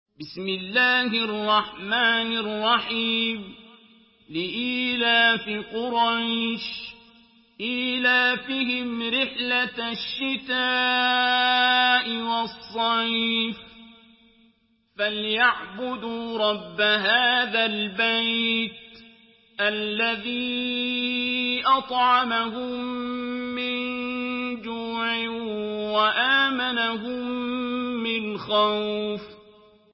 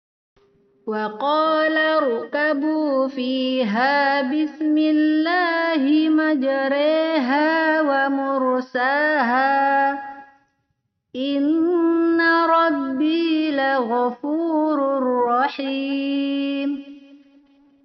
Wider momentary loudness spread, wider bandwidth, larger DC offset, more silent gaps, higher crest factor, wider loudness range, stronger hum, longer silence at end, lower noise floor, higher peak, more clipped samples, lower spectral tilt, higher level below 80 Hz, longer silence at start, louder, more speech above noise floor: first, 11 LU vs 6 LU; about the same, 5.8 kHz vs 6 kHz; neither; neither; about the same, 18 dB vs 14 dB; first, 5 LU vs 2 LU; neither; second, 0.55 s vs 0.7 s; second, -64 dBFS vs -73 dBFS; about the same, -6 dBFS vs -6 dBFS; neither; first, -7.5 dB/octave vs -1.5 dB/octave; first, -64 dBFS vs -74 dBFS; second, 0.2 s vs 0.85 s; second, -23 LUFS vs -20 LUFS; second, 40 dB vs 54 dB